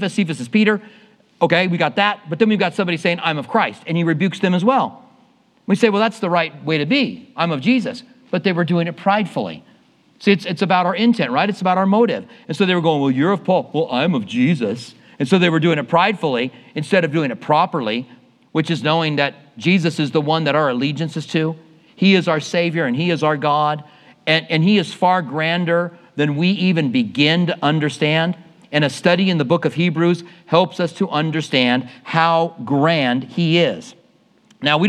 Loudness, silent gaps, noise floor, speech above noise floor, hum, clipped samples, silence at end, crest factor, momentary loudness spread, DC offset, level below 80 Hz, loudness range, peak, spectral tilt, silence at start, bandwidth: -18 LUFS; none; -55 dBFS; 38 dB; none; under 0.1%; 0 s; 18 dB; 7 LU; under 0.1%; -74 dBFS; 2 LU; 0 dBFS; -6.5 dB/octave; 0 s; 11 kHz